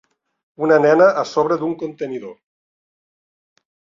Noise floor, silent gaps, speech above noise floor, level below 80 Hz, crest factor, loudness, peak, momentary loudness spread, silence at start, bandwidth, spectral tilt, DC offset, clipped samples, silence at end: under -90 dBFS; none; over 73 dB; -66 dBFS; 18 dB; -17 LUFS; -2 dBFS; 15 LU; 0.6 s; 7.6 kHz; -6.5 dB/octave; under 0.1%; under 0.1%; 1.65 s